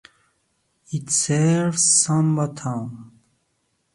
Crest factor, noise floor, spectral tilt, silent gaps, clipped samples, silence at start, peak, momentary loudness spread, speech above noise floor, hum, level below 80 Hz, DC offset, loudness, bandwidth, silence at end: 18 dB; -70 dBFS; -4 dB/octave; none; under 0.1%; 0.9 s; -4 dBFS; 16 LU; 50 dB; none; -62 dBFS; under 0.1%; -19 LUFS; 11.5 kHz; 0.9 s